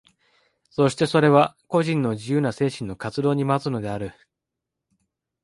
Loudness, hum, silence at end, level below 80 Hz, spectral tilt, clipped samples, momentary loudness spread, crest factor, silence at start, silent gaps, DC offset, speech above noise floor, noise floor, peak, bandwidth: -22 LUFS; none; 1.3 s; -58 dBFS; -6.5 dB/octave; under 0.1%; 13 LU; 20 dB; 0.8 s; none; under 0.1%; 63 dB; -84 dBFS; -2 dBFS; 11.5 kHz